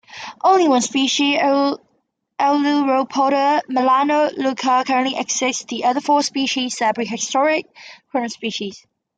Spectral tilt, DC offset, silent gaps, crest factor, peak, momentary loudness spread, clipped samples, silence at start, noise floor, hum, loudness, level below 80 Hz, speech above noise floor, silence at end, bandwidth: -2 dB/octave; under 0.1%; none; 16 dB; -4 dBFS; 9 LU; under 0.1%; 0.1 s; -68 dBFS; none; -18 LUFS; -72 dBFS; 50 dB; 0.4 s; 9.4 kHz